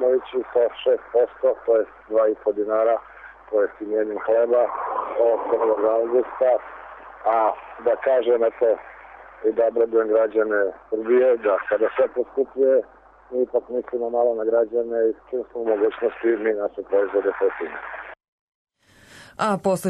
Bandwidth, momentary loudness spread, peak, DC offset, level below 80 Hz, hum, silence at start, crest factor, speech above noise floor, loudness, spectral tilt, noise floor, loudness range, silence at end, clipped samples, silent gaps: 11.5 kHz; 8 LU; -10 dBFS; under 0.1%; -62 dBFS; none; 0 s; 12 dB; 30 dB; -22 LUFS; -6 dB/octave; -51 dBFS; 3 LU; 0 s; under 0.1%; 18.28-18.67 s